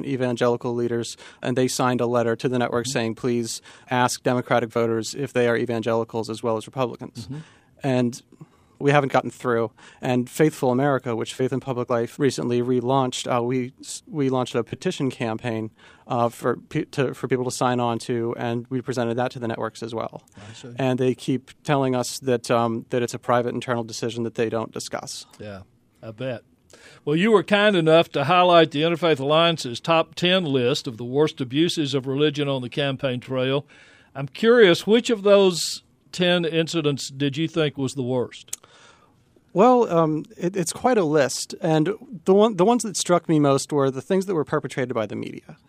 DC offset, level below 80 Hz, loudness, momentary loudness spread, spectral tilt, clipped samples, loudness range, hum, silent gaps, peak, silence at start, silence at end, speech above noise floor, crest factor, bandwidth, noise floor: under 0.1%; -66 dBFS; -22 LUFS; 13 LU; -5 dB/octave; under 0.1%; 7 LU; none; none; -2 dBFS; 0 s; 0.15 s; 36 dB; 20 dB; 15.5 kHz; -58 dBFS